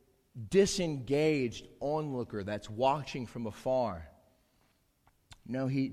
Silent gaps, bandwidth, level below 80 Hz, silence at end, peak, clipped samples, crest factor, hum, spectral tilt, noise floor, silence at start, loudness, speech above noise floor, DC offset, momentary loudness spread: none; 14.5 kHz; -58 dBFS; 0 s; -14 dBFS; under 0.1%; 20 dB; none; -5.5 dB/octave; -71 dBFS; 0.35 s; -33 LUFS; 39 dB; under 0.1%; 12 LU